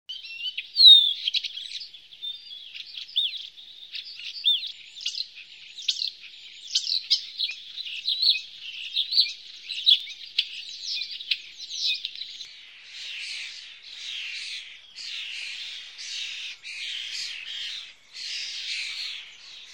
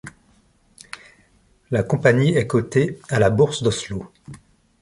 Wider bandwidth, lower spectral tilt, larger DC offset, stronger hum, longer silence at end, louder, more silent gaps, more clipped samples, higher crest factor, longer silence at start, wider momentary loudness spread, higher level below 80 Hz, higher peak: first, 16.5 kHz vs 11.5 kHz; second, 5 dB/octave vs -6 dB/octave; neither; neither; second, 0 s vs 0.45 s; second, -24 LUFS vs -20 LUFS; neither; neither; about the same, 24 dB vs 20 dB; about the same, 0.1 s vs 0.05 s; second, 17 LU vs 22 LU; second, -80 dBFS vs -48 dBFS; about the same, -4 dBFS vs -2 dBFS